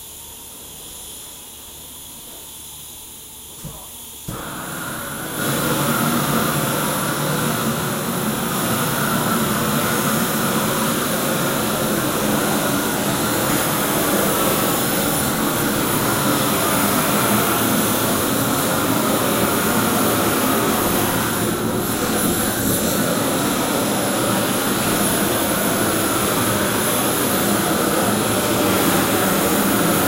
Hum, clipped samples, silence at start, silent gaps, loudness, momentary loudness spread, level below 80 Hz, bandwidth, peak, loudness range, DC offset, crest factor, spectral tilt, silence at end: none; under 0.1%; 0 s; none; -18 LUFS; 16 LU; -44 dBFS; 16 kHz; -4 dBFS; 9 LU; under 0.1%; 16 dB; -3.5 dB/octave; 0 s